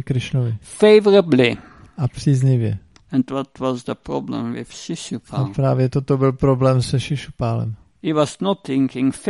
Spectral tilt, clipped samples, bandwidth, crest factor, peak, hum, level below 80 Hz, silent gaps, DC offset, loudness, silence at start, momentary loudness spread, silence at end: -7 dB/octave; under 0.1%; 11.5 kHz; 18 dB; 0 dBFS; none; -46 dBFS; none; under 0.1%; -19 LUFS; 0 s; 14 LU; 0 s